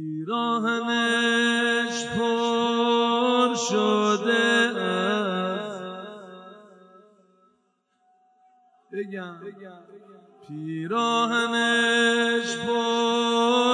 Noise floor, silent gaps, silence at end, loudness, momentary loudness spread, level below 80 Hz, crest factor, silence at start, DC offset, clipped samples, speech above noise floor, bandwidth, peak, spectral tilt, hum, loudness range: -70 dBFS; none; 0 s; -23 LUFS; 16 LU; -72 dBFS; 18 dB; 0 s; under 0.1%; under 0.1%; 47 dB; 10.5 kHz; -8 dBFS; -3.5 dB/octave; none; 19 LU